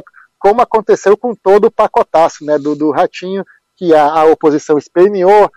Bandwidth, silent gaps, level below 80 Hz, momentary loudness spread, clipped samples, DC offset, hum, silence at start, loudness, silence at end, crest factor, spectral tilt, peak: 10 kHz; none; -50 dBFS; 7 LU; under 0.1%; under 0.1%; none; 0.4 s; -11 LUFS; 0.1 s; 10 dB; -6 dB/octave; 0 dBFS